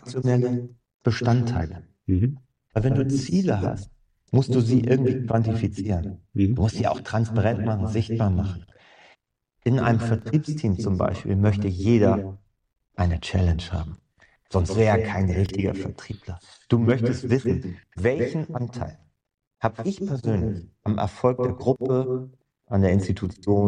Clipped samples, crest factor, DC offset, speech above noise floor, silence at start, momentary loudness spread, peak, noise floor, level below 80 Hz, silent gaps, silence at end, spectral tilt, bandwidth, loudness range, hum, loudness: under 0.1%; 18 dB; under 0.1%; 48 dB; 0.05 s; 11 LU; -6 dBFS; -71 dBFS; -42 dBFS; 0.94-1.00 s, 19.47-19.51 s; 0 s; -8 dB/octave; 9.8 kHz; 3 LU; none; -24 LUFS